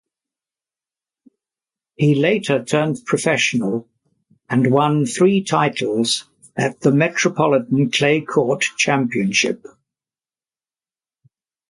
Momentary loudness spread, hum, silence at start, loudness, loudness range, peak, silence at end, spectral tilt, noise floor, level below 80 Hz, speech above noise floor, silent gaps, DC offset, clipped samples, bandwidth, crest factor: 6 LU; none; 2 s; -18 LUFS; 4 LU; -2 dBFS; 2.15 s; -5 dB/octave; under -90 dBFS; -62 dBFS; over 73 dB; none; under 0.1%; under 0.1%; 11.5 kHz; 18 dB